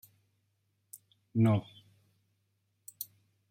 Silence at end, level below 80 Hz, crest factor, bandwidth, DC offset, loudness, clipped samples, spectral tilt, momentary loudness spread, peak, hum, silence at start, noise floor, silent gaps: 0.45 s; -74 dBFS; 20 dB; 16.5 kHz; under 0.1%; -32 LUFS; under 0.1%; -7.5 dB/octave; 25 LU; -16 dBFS; none; 1.35 s; -78 dBFS; none